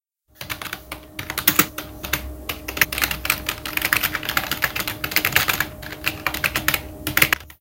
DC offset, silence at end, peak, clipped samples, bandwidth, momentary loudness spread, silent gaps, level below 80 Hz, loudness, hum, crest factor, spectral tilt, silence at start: under 0.1%; 0.05 s; 0 dBFS; under 0.1%; 17.5 kHz; 13 LU; none; -42 dBFS; -21 LUFS; none; 24 dB; -2 dB/octave; 0.4 s